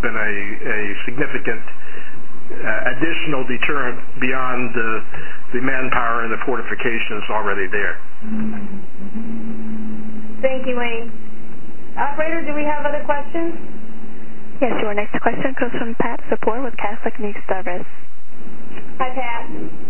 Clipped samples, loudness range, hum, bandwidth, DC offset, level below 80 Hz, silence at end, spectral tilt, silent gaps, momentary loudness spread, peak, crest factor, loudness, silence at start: under 0.1%; 4 LU; none; 3.2 kHz; 30%; -52 dBFS; 0 s; -8.5 dB/octave; none; 17 LU; 0 dBFS; 20 dB; -23 LUFS; 0 s